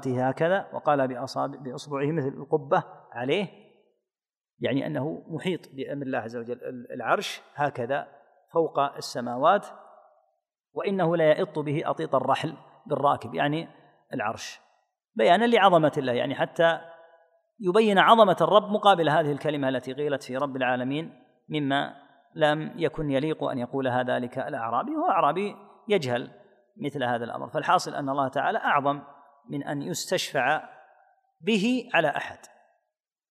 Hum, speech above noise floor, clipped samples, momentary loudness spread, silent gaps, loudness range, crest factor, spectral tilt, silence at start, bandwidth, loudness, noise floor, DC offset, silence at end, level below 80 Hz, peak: none; over 65 dB; under 0.1%; 14 LU; none; 9 LU; 24 dB; -5.5 dB/octave; 0 s; 15 kHz; -26 LUFS; under -90 dBFS; under 0.1%; 0.85 s; -64 dBFS; -2 dBFS